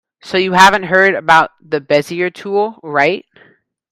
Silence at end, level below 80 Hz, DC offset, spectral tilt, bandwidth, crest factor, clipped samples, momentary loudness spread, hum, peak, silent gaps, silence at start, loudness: 0.75 s; -52 dBFS; under 0.1%; -4 dB/octave; 17 kHz; 14 dB; 0.3%; 11 LU; none; 0 dBFS; none; 0.25 s; -13 LUFS